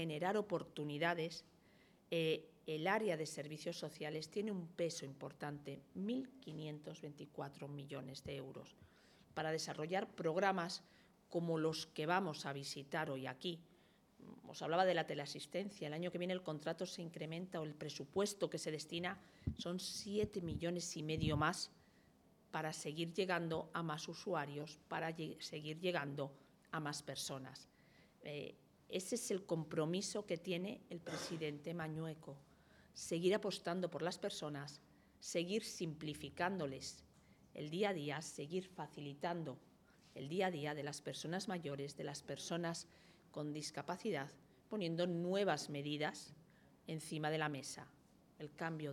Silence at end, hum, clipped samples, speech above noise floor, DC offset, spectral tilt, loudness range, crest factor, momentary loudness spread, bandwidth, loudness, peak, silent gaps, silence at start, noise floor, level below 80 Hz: 0 s; none; under 0.1%; 27 dB; under 0.1%; -4.5 dB/octave; 4 LU; 24 dB; 12 LU; 18 kHz; -43 LUFS; -20 dBFS; none; 0 s; -70 dBFS; -72 dBFS